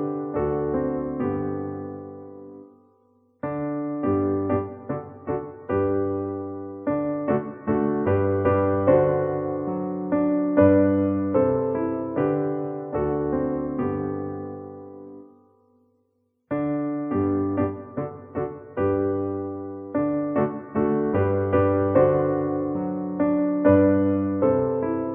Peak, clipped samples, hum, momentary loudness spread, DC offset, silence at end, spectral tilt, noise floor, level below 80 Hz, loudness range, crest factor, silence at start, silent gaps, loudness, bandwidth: -6 dBFS; under 0.1%; none; 13 LU; under 0.1%; 0 s; -10 dB/octave; -70 dBFS; -52 dBFS; 8 LU; 18 dB; 0 s; none; -24 LUFS; 3.2 kHz